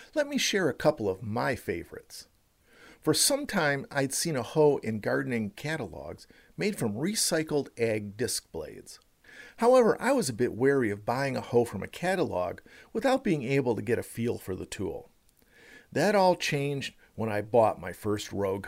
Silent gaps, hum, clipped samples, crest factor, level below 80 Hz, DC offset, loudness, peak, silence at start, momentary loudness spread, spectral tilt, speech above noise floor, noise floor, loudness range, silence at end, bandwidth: none; none; under 0.1%; 18 dB; -60 dBFS; under 0.1%; -28 LUFS; -10 dBFS; 0 s; 14 LU; -4 dB/octave; 34 dB; -62 dBFS; 4 LU; 0 s; 16 kHz